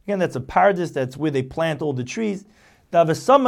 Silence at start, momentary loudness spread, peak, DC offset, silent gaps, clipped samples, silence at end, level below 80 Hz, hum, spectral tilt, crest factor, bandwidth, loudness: 0.05 s; 8 LU; -2 dBFS; under 0.1%; none; under 0.1%; 0 s; -52 dBFS; none; -6 dB/octave; 18 dB; 14.5 kHz; -21 LUFS